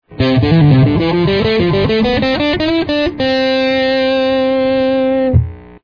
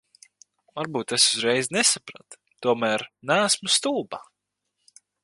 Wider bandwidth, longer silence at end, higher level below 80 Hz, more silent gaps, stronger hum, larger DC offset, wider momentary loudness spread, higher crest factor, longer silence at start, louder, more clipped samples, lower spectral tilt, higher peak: second, 5.4 kHz vs 11.5 kHz; second, 0.1 s vs 1 s; first, -32 dBFS vs -74 dBFS; neither; second, none vs 50 Hz at -60 dBFS; first, 0.3% vs under 0.1%; second, 5 LU vs 16 LU; second, 12 dB vs 20 dB; second, 0.1 s vs 0.75 s; first, -13 LUFS vs -22 LUFS; neither; first, -8 dB/octave vs -1.5 dB/octave; first, 0 dBFS vs -6 dBFS